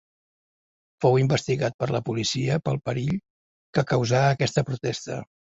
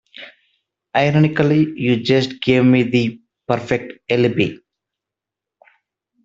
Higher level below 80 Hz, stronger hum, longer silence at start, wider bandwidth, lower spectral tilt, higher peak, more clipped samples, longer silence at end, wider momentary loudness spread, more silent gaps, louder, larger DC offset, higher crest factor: about the same, -56 dBFS vs -54 dBFS; neither; first, 1 s vs 0.2 s; about the same, 7.8 kHz vs 7.6 kHz; second, -5.5 dB/octave vs -7.5 dB/octave; second, -6 dBFS vs 0 dBFS; neither; second, 0.2 s vs 1.7 s; about the same, 8 LU vs 9 LU; first, 1.74-1.79 s, 3.30-3.73 s vs none; second, -25 LUFS vs -17 LUFS; neither; about the same, 20 dB vs 18 dB